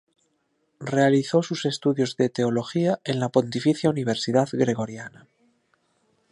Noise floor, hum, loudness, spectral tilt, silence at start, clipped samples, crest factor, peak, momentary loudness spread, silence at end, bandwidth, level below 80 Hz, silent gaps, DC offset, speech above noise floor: -71 dBFS; none; -23 LUFS; -6 dB/octave; 0.8 s; under 0.1%; 20 dB; -4 dBFS; 8 LU; 1.25 s; 11 kHz; -66 dBFS; none; under 0.1%; 48 dB